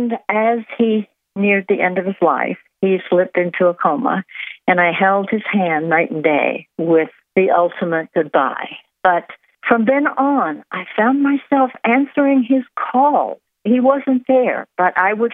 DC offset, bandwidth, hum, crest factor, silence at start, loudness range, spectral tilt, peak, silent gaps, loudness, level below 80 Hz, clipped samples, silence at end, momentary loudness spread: under 0.1%; 3.9 kHz; none; 16 dB; 0 s; 2 LU; -9.5 dB/octave; 0 dBFS; none; -17 LUFS; -72 dBFS; under 0.1%; 0 s; 7 LU